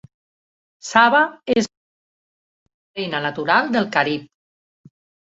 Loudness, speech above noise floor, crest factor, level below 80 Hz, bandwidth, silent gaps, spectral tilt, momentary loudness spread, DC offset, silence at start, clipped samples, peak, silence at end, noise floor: -19 LUFS; over 72 dB; 20 dB; -62 dBFS; 8 kHz; 1.77-2.66 s, 2.74-2.94 s; -4 dB/octave; 15 LU; under 0.1%; 0.85 s; under 0.1%; -2 dBFS; 1.05 s; under -90 dBFS